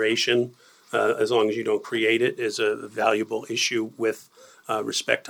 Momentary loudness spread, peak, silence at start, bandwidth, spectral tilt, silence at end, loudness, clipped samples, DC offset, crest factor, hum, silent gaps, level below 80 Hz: 7 LU; -4 dBFS; 0 s; 18.5 kHz; -3 dB/octave; 0 s; -24 LUFS; under 0.1%; under 0.1%; 20 dB; none; none; -80 dBFS